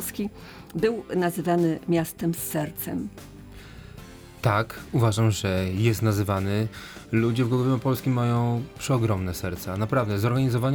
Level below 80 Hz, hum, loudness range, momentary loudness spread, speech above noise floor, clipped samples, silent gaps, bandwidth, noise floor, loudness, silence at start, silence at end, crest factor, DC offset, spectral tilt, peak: -52 dBFS; none; 4 LU; 19 LU; 19 dB; under 0.1%; none; over 20 kHz; -44 dBFS; -25 LUFS; 0 s; 0 s; 18 dB; under 0.1%; -6.5 dB/octave; -8 dBFS